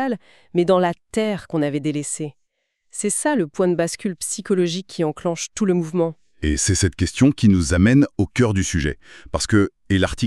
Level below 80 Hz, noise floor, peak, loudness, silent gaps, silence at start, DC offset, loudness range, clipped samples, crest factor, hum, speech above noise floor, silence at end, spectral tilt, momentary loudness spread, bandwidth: -38 dBFS; -70 dBFS; -2 dBFS; -20 LUFS; none; 0 s; 0.2%; 5 LU; under 0.1%; 18 dB; none; 50 dB; 0 s; -5 dB/octave; 10 LU; 13 kHz